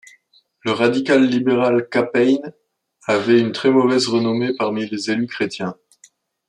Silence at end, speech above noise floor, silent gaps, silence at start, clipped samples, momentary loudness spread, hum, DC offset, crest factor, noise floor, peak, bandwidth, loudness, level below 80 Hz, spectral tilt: 0.75 s; 40 dB; none; 0.65 s; under 0.1%; 8 LU; none; under 0.1%; 16 dB; -57 dBFS; -2 dBFS; 10.5 kHz; -18 LUFS; -66 dBFS; -5.5 dB/octave